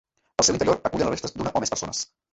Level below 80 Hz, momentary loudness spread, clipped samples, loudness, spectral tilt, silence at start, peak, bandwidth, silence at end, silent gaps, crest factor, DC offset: -50 dBFS; 10 LU; under 0.1%; -24 LUFS; -3 dB/octave; 0.4 s; -4 dBFS; 8.2 kHz; 0.3 s; none; 22 dB; under 0.1%